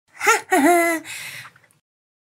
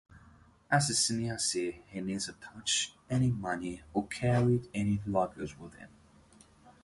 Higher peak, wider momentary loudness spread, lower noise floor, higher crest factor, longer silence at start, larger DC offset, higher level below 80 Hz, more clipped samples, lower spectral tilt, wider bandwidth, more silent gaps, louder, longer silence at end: first, -2 dBFS vs -14 dBFS; first, 17 LU vs 12 LU; second, -41 dBFS vs -60 dBFS; about the same, 20 dB vs 20 dB; about the same, 0.2 s vs 0.1 s; neither; second, -78 dBFS vs -58 dBFS; neither; second, -2 dB/octave vs -4 dB/octave; first, 16.5 kHz vs 11.5 kHz; neither; first, -18 LUFS vs -32 LUFS; first, 0.9 s vs 0.15 s